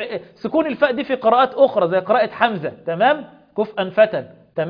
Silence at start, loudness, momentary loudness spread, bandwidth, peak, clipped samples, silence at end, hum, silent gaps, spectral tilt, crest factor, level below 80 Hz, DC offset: 0 s; -18 LUFS; 12 LU; 5.2 kHz; 0 dBFS; under 0.1%; 0 s; none; none; -8 dB/octave; 18 dB; -62 dBFS; under 0.1%